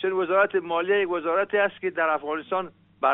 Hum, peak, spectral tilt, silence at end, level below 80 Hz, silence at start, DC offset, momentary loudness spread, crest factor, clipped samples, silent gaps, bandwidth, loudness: none; -8 dBFS; -2 dB/octave; 0 s; -74 dBFS; 0 s; under 0.1%; 7 LU; 16 dB; under 0.1%; none; 4 kHz; -24 LUFS